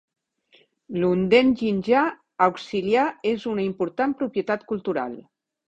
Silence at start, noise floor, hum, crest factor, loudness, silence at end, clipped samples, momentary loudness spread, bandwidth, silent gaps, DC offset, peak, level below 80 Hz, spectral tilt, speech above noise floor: 0.9 s; -60 dBFS; none; 20 dB; -23 LUFS; 0.5 s; under 0.1%; 10 LU; 8.2 kHz; none; under 0.1%; -4 dBFS; -60 dBFS; -7 dB/octave; 38 dB